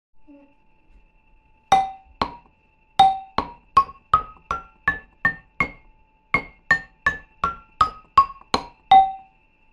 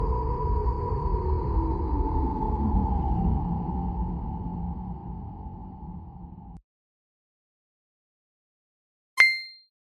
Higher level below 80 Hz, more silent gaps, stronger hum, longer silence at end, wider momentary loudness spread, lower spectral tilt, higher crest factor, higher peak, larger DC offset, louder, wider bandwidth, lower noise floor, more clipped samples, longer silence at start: second, -46 dBFS vs -32 dBFS; second, none vs 6.64-9.17 s; neither; first, 0.55 s vs 0.4 s; second, 12 LU vs 18 LU; second, -3.5 dB/octave vs -6.5 dB/octave; second, 22 dB vs 28 dB; about the same, -2 dBFS vs 0 dBFS; neither; first, -22 LUFS vs -27 LUFS; first, 11.5 kHz vs 9.6 kHz; second, -59 dBFS vs under -90 dBFS; neither; first, 1.7 s vs 0 s